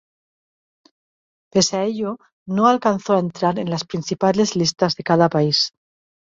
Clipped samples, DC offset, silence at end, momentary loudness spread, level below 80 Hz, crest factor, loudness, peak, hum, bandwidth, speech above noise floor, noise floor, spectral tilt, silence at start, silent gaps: under 0.1%; under 0.1%; 0.55 s; 9 LU; -60 dBFS; 18 dB; -19 LUFS; -2 dBFS; none; 7.8 kHz; over 71 dB; under -90 dBFS; -4.5 dB/octave; 1.55 s; 2.32-2.46 s